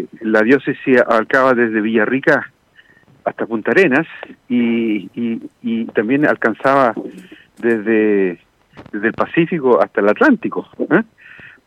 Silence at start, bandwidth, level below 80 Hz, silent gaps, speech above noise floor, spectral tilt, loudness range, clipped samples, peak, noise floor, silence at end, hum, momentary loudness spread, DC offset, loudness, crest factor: 0 s; 9.4 kHz; -62 dBFS; none; 35 dB; -7.5 dB/octave; 3 LU; under 0.1%; -2 dBFS; -50 dBFS; 0.2 s; none; 12 LU; under 0.1%; -16 LUFS; 14 dB